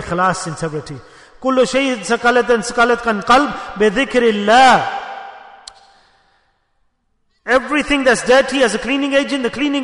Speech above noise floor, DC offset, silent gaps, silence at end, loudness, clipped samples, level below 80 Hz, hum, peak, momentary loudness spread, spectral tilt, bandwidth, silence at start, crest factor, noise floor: 49 dB; under 0.1%; none; 0 s; -15 LUFS; under 0.1%; -44 dBFS; none; 0 dBFS; 14 LU; -3.5 dB/octave; 11 kHz; 0 s; 16 dB; -64 dBFS